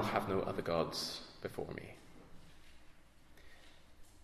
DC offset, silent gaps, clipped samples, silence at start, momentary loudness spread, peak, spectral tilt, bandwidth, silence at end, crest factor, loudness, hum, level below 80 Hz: under 0.1%; none; under 0.1%; 0 s; 25 LU; -16 dBFS; -4.5 dB/octave; 14 kHz; 0 s; 24 dB; -39 LUFS; none; -62 dBFS